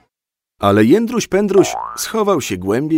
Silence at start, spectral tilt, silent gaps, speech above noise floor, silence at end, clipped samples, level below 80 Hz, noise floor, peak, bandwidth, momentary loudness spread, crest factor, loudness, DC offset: 0.6 s; -5 dB/octave; none; 71 dB; 0 s; under 0.1%; -50 dBFS; -86 dBFS; 0 dBFS; 16.5 kHz; 7 LU; 16 dB; -15 LUFS; under 0.1%